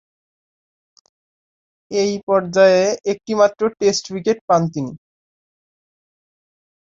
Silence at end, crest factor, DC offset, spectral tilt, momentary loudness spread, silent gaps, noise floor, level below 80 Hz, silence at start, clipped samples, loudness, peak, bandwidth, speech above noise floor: 1.9 s; 18 dB; under 0.1%; -4.5 dB/octave; 11 LU; 2.23-2.27 s, 4.41-4.48 s; under -90 dBFS; -62 dBFS; 1.9 s; under 0.1%; -18 LUFS; -2 dBFS; 7.6 kHz; over 73 dB